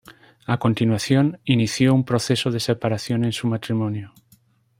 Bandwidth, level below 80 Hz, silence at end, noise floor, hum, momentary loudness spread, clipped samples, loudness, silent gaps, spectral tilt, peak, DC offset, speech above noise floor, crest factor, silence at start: 16 kHz; -58 dBFS; 0.7 s; -58 dBFS; none; 7 LU; under 0.1%; -21 LUFS; none; -6 dB/octave; -2 dBFS; under 0.1%; 38 dB; 18 dB; 0.1 s